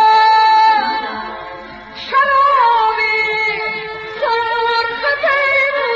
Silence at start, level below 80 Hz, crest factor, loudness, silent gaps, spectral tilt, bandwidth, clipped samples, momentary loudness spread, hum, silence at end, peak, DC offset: 0 s; -50 dBFS; 12 dB; -13 LUFS; none; 2 dB/octave; 7.6 kHz; under 0.1%; 16 LU; none; 0 s; -2 dBFS; under 0.1%